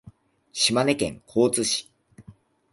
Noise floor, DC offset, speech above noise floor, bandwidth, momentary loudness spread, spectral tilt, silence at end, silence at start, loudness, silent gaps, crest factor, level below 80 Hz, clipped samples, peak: -52 dBFS; under 0.1%; 29 dB; 12 kHz; 7 LU; -3 dB/octave; 0.4 s; 0.05 s; -23 LUFS; none; 20 dB; -58 dBFS; under 0.1%; -6 dBFS